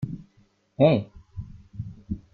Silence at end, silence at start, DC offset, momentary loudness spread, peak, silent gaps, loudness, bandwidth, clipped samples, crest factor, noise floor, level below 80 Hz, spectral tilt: 0.15 s; 0 s; under 0.1%; 21 LU; -6 dBFS; none; -24 LUFS; 4.7 kHz; under 0.1%; 22 dB; -63 dBFS; -50 dBFS; -10 dB/octave